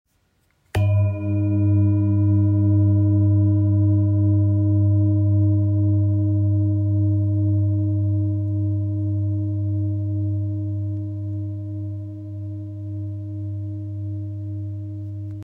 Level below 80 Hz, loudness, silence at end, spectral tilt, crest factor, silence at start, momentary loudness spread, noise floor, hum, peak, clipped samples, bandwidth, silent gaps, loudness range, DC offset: -52 dBFS; -21 LUFS; 0 s; -11 dB/octave; 10 dB; 0.75 s; 12 LU; -65 dBFS; none; -10 dBFS; under 0.1%; 3.1 kHz; none; 12 LU; under 0.1%